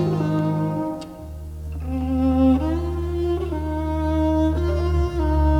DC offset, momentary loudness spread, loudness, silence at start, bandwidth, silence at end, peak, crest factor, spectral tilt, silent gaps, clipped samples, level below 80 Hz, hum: under 0.1%; 15 LU; -22 LUFS; 0 s; 8.8 kHz; 0 s; -8 dBFS; 14 dB; -9 dB/octave; none; under 0.1%; -26 dBFS; none